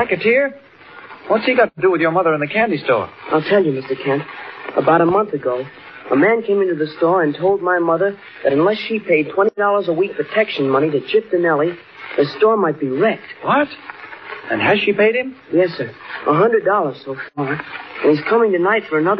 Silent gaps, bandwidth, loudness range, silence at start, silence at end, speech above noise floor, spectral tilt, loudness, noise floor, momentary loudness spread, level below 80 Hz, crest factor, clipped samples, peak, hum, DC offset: none; 5.6 kHz; 2 LU; 0 s; 0 s; 22 dB; -4 dB/octave; -17 LUFS; -39 dBFS; 11 LU; -64 dBFS; 14 dB; under 0.1%; -2 dBFS; none; under 0.1%